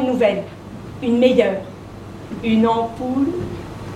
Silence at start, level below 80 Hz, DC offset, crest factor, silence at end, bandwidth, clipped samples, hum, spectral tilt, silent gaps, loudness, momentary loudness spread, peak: 0 s; -46 dBFS; under 0.1%; 18 dB; 0 s; 11 kHz; under 0.1%; none; -7 dB/octave; none; -19 LUFS; 20 LU; 0 dBFS